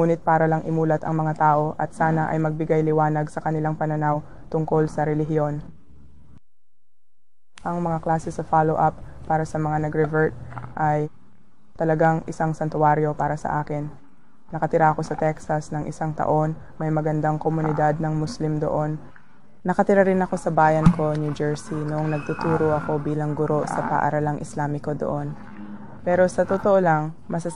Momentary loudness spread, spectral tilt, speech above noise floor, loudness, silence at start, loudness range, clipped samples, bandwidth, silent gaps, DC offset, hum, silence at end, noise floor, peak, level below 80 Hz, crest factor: 10 LU; -8 dB/octave; 62 dB; -23 LUFS; 0 s; 4 LU; under 0.1%; 10.5 kHz; none; 1%; none; 0 s; -84 dBFS; 0 dBFS; -46 dBFS; 22 dB